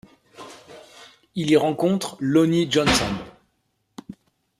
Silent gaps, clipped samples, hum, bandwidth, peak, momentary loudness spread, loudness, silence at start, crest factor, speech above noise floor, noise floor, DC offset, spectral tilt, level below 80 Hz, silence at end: none; under 0.1%; none; 14.5 kHz; -6 dBFS; 23 LU; -21 LUFS; 0.4 s; 18 dB; 51 dB; -71 dBFS; under 0.1%; -5 dB/octave; -48 dBFS; 0.45 s